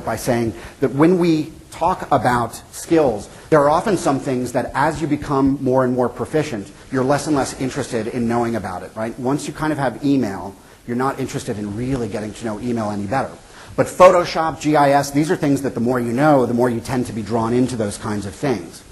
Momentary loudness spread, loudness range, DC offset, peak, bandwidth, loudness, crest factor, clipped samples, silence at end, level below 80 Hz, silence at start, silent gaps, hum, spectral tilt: 11 LU; 6 LU; under 0.1%; 0 dBFS; 12.5 kHz; -19 LUFS; 18 dB; under 0.1%; 0.1 s; -44 dBFS; 0 s; none; none; -6 dB/octave